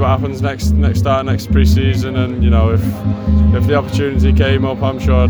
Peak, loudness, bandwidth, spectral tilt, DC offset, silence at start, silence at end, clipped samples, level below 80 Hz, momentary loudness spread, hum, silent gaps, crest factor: 0 dBFS; -14 LUFS; 19.5 kHz; -7.5 dB/octave; under 0.1%; 0 s; 0 s; under 0.1%; -18 dBFS; 5 LU; none; none; 12 dB